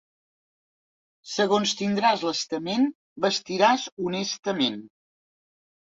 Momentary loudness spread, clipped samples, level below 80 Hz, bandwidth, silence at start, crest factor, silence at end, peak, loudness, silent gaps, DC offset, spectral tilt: 7 LU; under 0.1%; -70 dBFS; 7.8 kHz; 1.25 s; 22 dB; 1.05 s; -6 dBFS; -25 LUFS; 2.95-3.16 s, 3.92-3.97 s, 4.39-4.43 s; under 0.1%; -3.5 dB/octave